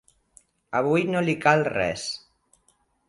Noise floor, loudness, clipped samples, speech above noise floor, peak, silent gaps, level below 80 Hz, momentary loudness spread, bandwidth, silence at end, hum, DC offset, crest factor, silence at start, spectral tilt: -67 dBFS; -24 LUFS; under 0.1%; 44 dB; -4 dBFS; none; -58 dBFS; 11 LU; 11.5 kHz; 0.9 s; none; under 0.1%; 22 dB; 0.7 s; -5.5 dB/octave